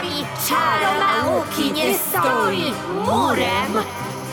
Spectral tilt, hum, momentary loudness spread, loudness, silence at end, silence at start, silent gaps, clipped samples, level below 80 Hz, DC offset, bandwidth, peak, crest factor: -3.5 dB/octave; none; 6 LU; -19 LUFS; 0 s; 0 s; none; under 0.1%; -52 dBFS; under 0.1%; over 20 kHz; -6 dBFS; 14 dB